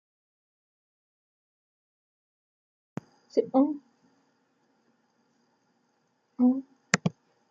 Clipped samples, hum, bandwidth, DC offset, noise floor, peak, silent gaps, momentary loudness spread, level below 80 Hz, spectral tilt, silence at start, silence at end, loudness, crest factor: under 0.1%; none; 7.4 kHz; under 0.1%; -73 dBFS; -4 dBFS; none; 18 LU; -80 dBFS; -5 dB/octave; 3.35 s; 0.4 s; -28 LUFS; 30 dB